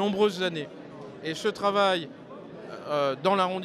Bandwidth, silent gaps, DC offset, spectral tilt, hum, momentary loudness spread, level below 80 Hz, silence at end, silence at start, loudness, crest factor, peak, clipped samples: 14 kHz; none; under 0.1%; -5 dB/octave; none; 19 LU; -72 dBFS; 0 s; 0 s; -27 LUFS; 18 dB; -10 dBFS; under 0.1%